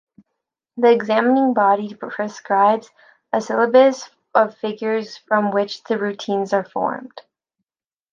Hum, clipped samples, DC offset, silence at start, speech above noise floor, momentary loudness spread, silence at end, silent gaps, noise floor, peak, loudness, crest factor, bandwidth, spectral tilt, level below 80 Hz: none; under 0.1%; under 0.1%; 0.75 s; over 72 dB; 11 LU; 0.95 s; none; under -90 dBFS; -2 dBFS; -19 LUFS; 18 dB; 7.4 kHz; -5.5 dB/octave; -74 dBFS